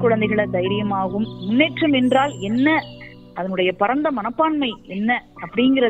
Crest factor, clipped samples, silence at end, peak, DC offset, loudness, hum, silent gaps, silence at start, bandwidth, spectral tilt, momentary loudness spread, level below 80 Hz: 16 dB; under 0.1%; 0 s; -4 dBFS; under 0.1%; -20 LUFS; none; none; 0 s; 9 kHz; -6.5 dB/octave; 9 LU; -52 dBFS